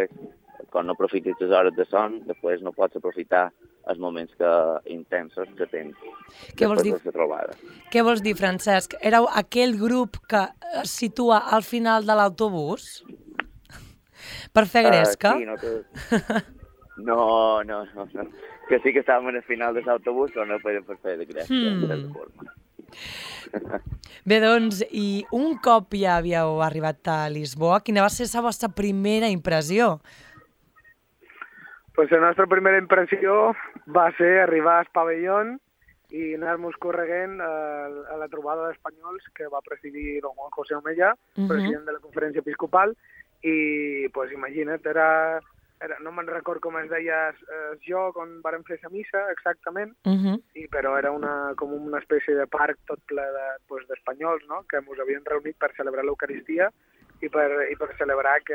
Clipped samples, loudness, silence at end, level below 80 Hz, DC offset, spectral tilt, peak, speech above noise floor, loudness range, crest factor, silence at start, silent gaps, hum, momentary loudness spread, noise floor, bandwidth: under 0.1%; -24 LUFS; 0 s; -54 dBFS; under 0.1%; -5 dB/octave; -4 dBFS; 34 dB; 8 LU; 20 dB; 0 s; none; none; 15 LU; -58 dBFS; 17 kHz